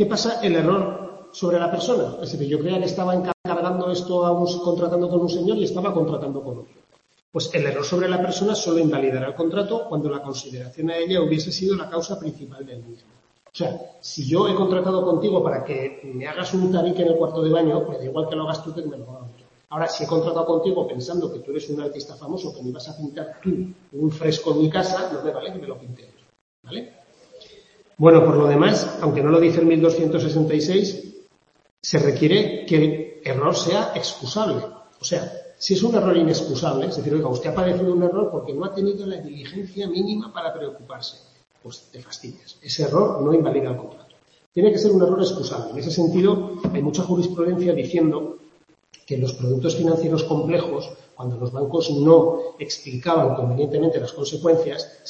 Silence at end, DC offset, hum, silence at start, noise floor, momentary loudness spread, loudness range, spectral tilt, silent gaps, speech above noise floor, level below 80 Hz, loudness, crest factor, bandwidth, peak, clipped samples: 0 s; under 0.1%; none; 0 s; -58 dBFS; 16 LU; 7 LU; -6 dB/octave; 3.34-3.44 s, 7.22-7.32 s, 26.41-26.63 s, 31.71-31.77 s, 44.46-44.52 s; 37 dB; -60 dBFS; -21 LUFS; 20 dB; 8 kHz; 0 dBFS; under 0.1%